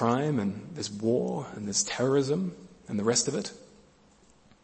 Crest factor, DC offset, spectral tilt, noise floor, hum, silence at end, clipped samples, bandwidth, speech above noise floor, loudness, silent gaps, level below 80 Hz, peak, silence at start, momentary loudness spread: 20 dB; under 0.1%; -4.5 dB/octave; -60 dBFS; none; 1 s; under 0.1%; 8.8 kHz; 32 dB; -29 LUFS; none; -66 dBFS; -10 dBFS; 0 s; 11 LU